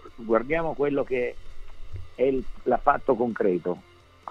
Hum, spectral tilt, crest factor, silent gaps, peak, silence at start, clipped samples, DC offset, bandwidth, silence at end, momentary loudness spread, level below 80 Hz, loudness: none; -8.5 dB/octave; 20 dB; none; -6 dBFS; 0 s; under 0.1%; under 0.1%; 7.2 kHz; 0 s; 17 LU; -42 dBFS; -26 LUFS